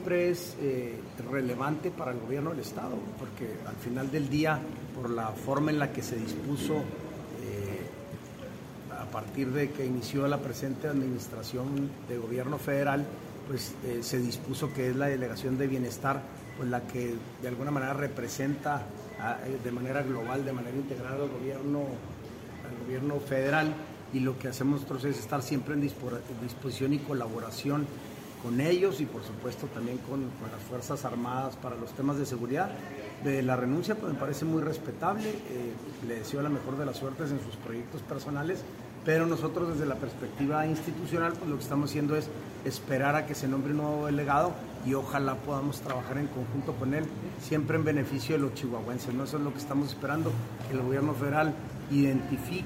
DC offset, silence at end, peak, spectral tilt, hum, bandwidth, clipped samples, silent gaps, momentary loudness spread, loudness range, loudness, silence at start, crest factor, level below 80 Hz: under 0.1%; 0 s; -14 dBFS; -6.5 dB/octave; none; 16 kHz; under 0.1%; none; 10 LU; 4 LU; -32 LUFS; 0 s; 18 dB; -60 dBFS